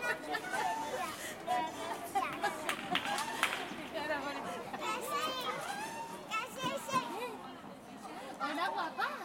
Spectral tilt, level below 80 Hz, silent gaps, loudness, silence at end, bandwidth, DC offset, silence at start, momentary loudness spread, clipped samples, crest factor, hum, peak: -2.5 dB/octave; -74 dBFS; none; -37 LUFS; 0 s; 16.5 kHz; under 0.1%; 0 s; 9 LU; under 0.1%; 26 dB; none; -12 dBFS